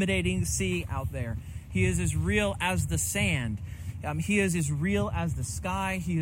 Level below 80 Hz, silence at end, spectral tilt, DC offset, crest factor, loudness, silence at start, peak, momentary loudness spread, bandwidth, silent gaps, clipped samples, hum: -42 dBFS; 0 s; -5 dB/octave; under 0.1%; 14 dB; -29 LUFS; 0 s; -14 dBFS; 9 LU; 16.5 kHz; none; under 0.1%; none